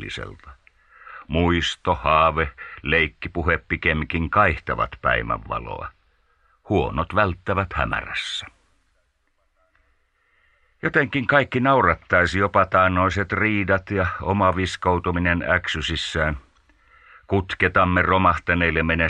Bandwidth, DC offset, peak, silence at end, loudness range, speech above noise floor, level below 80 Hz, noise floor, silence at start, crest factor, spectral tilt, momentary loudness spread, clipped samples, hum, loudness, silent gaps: 9.8 kHz; under 0.1%; -4 dBFS; 0 s; 7 LU; 46 dB; -38 dBFS; -67 dBFS; 0 s; 20 dB; -6 dB/octave; 10 LU; under 0.1%; none; -21 LUFS; none